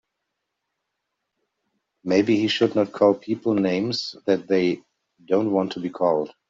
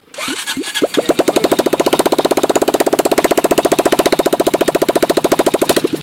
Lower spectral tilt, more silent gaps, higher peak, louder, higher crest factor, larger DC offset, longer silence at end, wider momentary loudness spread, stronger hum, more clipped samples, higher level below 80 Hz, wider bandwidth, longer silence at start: first, -6 dB/octave vs -3.5 dB/octave; neither; second, -4 dBFS vs 0 dBFS; second, -22 LUFS vs -13 LUFS; first, 20 dB vs 14 dB; neither; first, 0.2 s vs 0 s; first, 7 LU vs 3 LU; neither; neither; second, -66 dBFS vs -46 dBFS; second, 7.6 kHz vs 17.5 kHz; first, 2.05 s vs 0.15 s